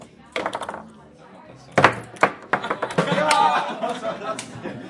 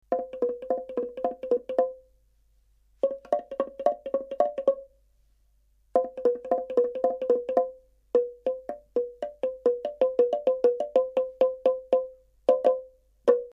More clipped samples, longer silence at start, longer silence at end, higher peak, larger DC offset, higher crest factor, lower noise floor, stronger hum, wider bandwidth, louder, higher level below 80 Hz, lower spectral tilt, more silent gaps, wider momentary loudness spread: neither; about the same, 0 s vs 0.1 s; about the same, 0 s vs 0 s; first, 0 dBFS vs -8 dBFS; neither; about the same, 24 dB vs 20 dB; second, -46 dBFS vs -65 dBFS; neither; first, 11.5 kHz vs 6 kHz; first, -22 LUFS vs -28 LUFS; about the same, -62 dBFS vs -66 dBFS; second, -4 dB/octave vs -6 dB/octave; neither; first, 14 LU vs 8 LU